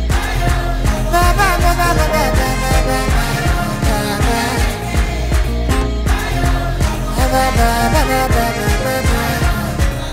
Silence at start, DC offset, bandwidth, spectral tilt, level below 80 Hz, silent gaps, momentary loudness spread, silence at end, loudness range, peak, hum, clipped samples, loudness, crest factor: 0 s; under 0.1%; 16 kHz; -5 dB/octave; -18 dBFS; none; 4 LU; 0 s; 2 LU; 0 dBFS; none; under 0.1%; -16 LUFS; 14 dB